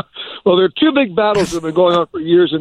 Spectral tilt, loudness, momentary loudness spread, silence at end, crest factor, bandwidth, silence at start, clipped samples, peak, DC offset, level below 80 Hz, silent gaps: -5.5 dB/octave; -14 LUFS; 4 LU; 0 s; 12 dB; 11 kHz; 0.15 s; under 0.1%; -2 dBFS; under 0.1%; -48 dBFS; none